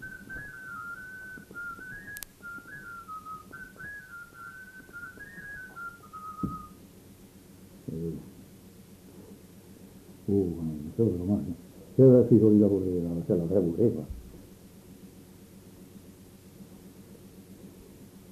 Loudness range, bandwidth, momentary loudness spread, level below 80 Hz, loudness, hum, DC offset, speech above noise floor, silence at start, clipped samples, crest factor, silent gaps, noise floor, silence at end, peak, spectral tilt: 20 LU; 14 kHz; 28 LU; -56 dBFS; -27 LUFS; none; under 0.1%; 29 dB; 0 s; under 0.1%; 22 dB; none; -52 dBFS; 0 s; -8 dBFS; -8.5 dB/octave